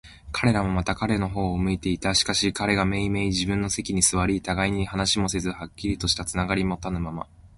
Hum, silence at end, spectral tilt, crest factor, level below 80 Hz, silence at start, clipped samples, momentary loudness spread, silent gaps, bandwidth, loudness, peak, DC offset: none; 0.1 s; -4 dB/octave; 20 dB; -40 dBFS; 0.05 s; under 0.1%; 9 LU; none; 11.5 kHz; -24 LUFS; -4 dBFS; under 0.1%